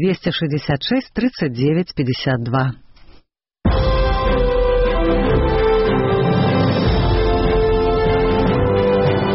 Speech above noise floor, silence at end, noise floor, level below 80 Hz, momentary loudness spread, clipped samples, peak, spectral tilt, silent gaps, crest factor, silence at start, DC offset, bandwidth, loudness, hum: 32 dB; 0 s; -51 dBFS; -24 dBFS; 4 LU; under 0.1%; -6 dBFS; -5.5 dB/octave; none; 10 dB; 0 s; under 0.1%; 6 kHz; -17 LUFS; none